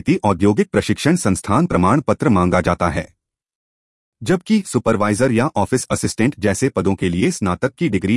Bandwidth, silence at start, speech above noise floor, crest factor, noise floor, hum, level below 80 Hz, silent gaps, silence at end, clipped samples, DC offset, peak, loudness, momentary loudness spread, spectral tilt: 12 kHz; 0.05 s; over 73 dB; 16 dB; under -90 dBFS; none; -44 dBFS; 3.55-4.12 s; 0 s; under 0.1%; under 0.1%; -2 dBFS; -17 LUFS; 5 LU; -6 dB/octave